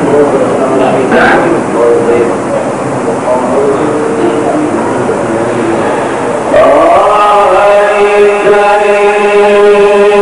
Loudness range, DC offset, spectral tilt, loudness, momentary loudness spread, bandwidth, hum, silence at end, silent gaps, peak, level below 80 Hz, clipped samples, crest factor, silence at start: 5 LU; 0.7%; -5.5 dB/octave; -7 LUFS; 7 LU; 11 kHz; none; 0 s; none; 0 dBFS; -40 dBFS; 0.4%; 6 dB; 0 s